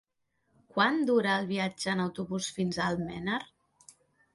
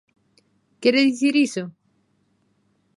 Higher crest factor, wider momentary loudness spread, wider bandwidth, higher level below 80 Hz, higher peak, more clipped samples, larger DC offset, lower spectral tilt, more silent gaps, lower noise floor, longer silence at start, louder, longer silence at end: about the same, 22 dB vs 20 dB; second, 8 LU vs 13 LU; about the same, 11.5 kHz vs 11.5 kHz; first, -64 dBFS vs -78 dBFS; second, -10 dBFS vs -4 dBFS; neither; neither; about the same, -5 dB/octave vs -4 dB/octave; neither; first, -76 dBFS vs -66 dBFS; about the same, 0.75 s vs 0.8 s; second, -30 LUFS vs -20 LUFS; second, 0.9 s vs 1.25 s